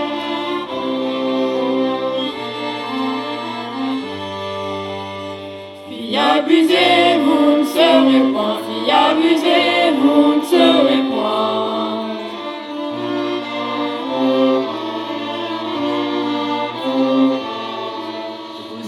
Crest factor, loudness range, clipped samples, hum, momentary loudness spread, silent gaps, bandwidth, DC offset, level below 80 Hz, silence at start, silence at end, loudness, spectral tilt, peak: 16 dB; 9 LU; under 0.1%; none; 14 LU; none; 15 kHz; under 0.1%; -68 dBFS; 0 s; 0 s; -17 LUFS; -4.5 dB/octave; 0 dBFS